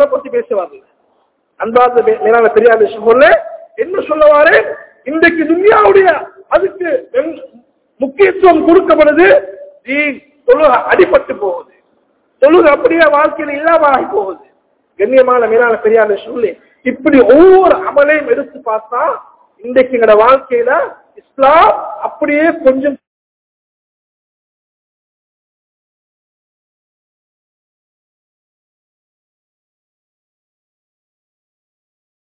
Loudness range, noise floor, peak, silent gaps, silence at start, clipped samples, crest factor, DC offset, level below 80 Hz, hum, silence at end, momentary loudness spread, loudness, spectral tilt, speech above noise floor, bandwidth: 4 LU; -58 dBFS; 0 dBFS; none; 0 s; 2%; 12 dB; under 0.1%; -48 dBFS; none; 9.3 s; 13 LU; -10 LUFS; -8.5 dB/octave; 49 dB; 4 kHz